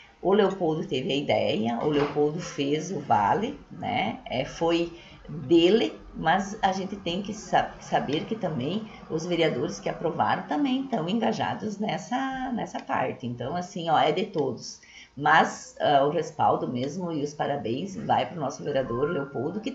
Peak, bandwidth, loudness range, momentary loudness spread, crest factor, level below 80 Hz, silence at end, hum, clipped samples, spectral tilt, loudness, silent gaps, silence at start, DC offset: -6 dBFS; 8 kHz; 3 LU; 9 LU; 22 dB; -56 dBFS; 0 s; none; under 0.1%; -5.5 dB/octave; -27 LUFS; none; 0 s; under 0.1%